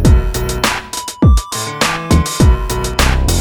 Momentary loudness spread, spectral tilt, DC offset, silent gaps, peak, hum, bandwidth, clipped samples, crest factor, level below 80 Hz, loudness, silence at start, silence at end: 7 LU; -4.5 dB/octave; under 0.1%; none; 0 dBFS; none; over 20 kHz; under 0.1%; 12 dB; -16 dBFS; -14 LUFS; 0 s; 0 s